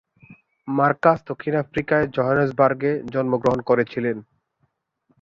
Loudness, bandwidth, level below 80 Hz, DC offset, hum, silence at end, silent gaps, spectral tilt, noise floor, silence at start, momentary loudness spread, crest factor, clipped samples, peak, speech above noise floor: -21 LUFS; 7.4 kHz; -56 dBFS; under 0.1%; none; 1 s; none; -8.5 dB/octave; -70 dBFS; 0.3 s; 8 LU; 18 dB; under 0.1%; -4 dBFS; 50 dB